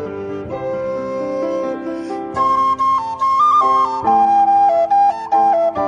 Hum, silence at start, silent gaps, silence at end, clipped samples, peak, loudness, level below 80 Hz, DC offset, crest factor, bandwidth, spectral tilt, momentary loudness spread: none; 0 s; none; 0 s; under 0.1%; -4 dBFS; -16 LUFS; -54 dBFS; under 0.1%; 12 dB; 9.4 kHz; -6 dB/octave; 12 LU